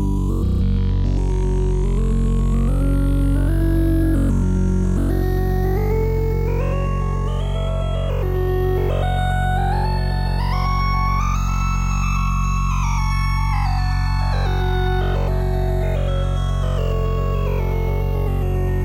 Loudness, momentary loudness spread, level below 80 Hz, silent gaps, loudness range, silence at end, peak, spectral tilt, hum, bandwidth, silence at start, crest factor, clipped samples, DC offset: -21 LUFS; 3 LU; -20 dBFS; none; 2 LU; 0 s; -8 dBFS; -7 dB/octave; none; 14 kHz; 0 s; 10 dB; under 0.1%; under 0.1%